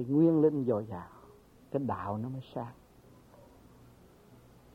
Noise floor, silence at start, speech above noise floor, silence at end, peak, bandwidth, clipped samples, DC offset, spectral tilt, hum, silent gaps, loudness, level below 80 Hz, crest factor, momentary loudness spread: -58 dBFS; 0 s; 28 dB; 0.4 s; -14 dBFS; 5.2 kHz; under 0.1%; under 0.1%; -10 dB/octave; none; none; -31 LUFS; -66 dBFS; 18 dB; 19 LU